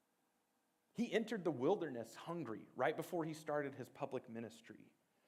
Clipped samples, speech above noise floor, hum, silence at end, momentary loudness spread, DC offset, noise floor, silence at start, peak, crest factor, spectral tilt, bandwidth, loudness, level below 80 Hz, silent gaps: under 0.1%; 40 dB; none; 0.4 s; 15 LU; under 0.1%; -82 dBFS; 0.95 s; -24 dBFS; 20 dB; -6 dB/octave; 16 kHz; -43 LUFS; under -90 dBFS; none